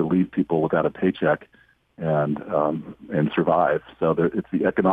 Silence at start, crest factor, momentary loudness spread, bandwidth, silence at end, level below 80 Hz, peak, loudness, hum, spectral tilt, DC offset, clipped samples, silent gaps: 0 s; 16 dB; 5 LU; 4.7 kHz; 0 s; -56 dBFS; -6 dBFS; -23 LUFS; none; -10 dB/octave; under 0.1%; under 0.1%; none